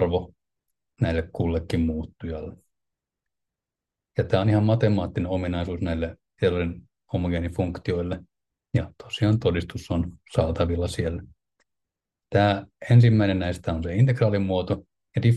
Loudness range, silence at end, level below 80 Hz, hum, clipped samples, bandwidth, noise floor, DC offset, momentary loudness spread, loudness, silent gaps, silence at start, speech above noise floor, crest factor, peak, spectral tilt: 7 LU; 0 s; -46 dBFS; none; under 0.1%; 10 kHz; -88 dBFS; under 0.1%; 12 LU; -25 LUFS; none; 0 s; 65 dB; 18 dB; -6 dBFS; -8 dB/octave